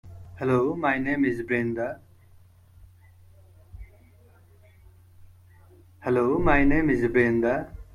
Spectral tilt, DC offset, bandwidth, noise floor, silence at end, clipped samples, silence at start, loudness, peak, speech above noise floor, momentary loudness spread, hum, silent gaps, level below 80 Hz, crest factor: -8.5 dB/octave; under 0.1%; 11.5 kHz; -54 dBFS; 0.1 s; under 0.1%; 0.05 s; -24 LUFS; -8 dBFS; 32 dB; 11 LU; none; none; -40 dBFS; 18 dB